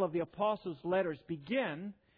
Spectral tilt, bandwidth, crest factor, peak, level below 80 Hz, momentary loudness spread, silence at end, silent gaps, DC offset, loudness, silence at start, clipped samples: -4.5 dB/octave; 5.2 kHz; 16 dB; -20 dBFS; -72 dBFS; 6 LU; 0.25 s; none; under 0.1%; -36 LUFS; 0 s; under 0.1%